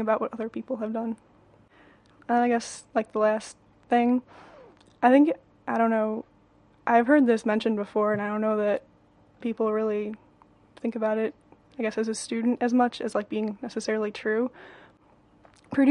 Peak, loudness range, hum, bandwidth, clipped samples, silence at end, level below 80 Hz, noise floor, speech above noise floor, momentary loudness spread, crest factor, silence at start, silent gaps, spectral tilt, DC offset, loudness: -6 dBFS; 5 LU; none; 11 kHz; under 0.1%; 0 s; -68 dBFS; -59 dBFS; 34 dB; 13 LU; 20 dB; 0 s; none; -5.5 dB/octave; under 0.1%; -26 LUFS